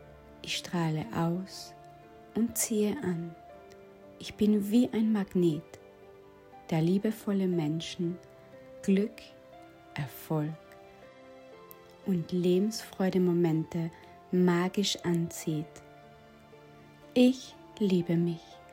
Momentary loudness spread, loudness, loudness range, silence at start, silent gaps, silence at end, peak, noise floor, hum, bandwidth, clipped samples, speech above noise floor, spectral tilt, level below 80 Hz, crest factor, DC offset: 21 LU; -30 LUFS; 6 LU; 0 s; none; 0.1 s; -12 dBFS; -54 dBFS; none; 16 kHz; under 0.1%; 25 dB; -6 dB/octave; -66 dBFS; 20 dB; under 0.1%